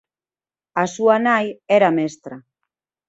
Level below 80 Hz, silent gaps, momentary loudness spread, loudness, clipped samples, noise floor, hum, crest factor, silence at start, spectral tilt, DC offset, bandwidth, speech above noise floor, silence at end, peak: -68 dBFS; none; 14 LU; -18 LUFS; under 0.1%; under -90 dBFS; none; 18 dB; 0.75 s; -5.5 dB/octave; under 0.1%; 8 kHz; over 72 dB; 0.7 s; -2 dBFS